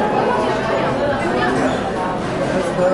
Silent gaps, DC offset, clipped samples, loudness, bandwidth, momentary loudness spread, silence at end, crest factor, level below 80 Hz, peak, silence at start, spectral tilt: none; under 0.1%; under 0.1%; -18 LUFS; 11.5 kHz; 4 LU; 0 s; 12 dB; -40 dBFS; -4 dBFS; 0 s; -6 dB/octave